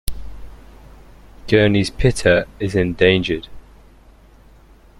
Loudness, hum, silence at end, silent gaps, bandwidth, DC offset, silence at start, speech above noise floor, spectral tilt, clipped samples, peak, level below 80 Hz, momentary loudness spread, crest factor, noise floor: -17 LUFS; none; 1.4 s; none; 16.5 kHz; under 0.1%; 0.05 s; 31 dB; -5.5 dB/octave; under 0.1%; 0 dBFS; -34 dBFS; 21 LU; 18 dB; -47 dBFS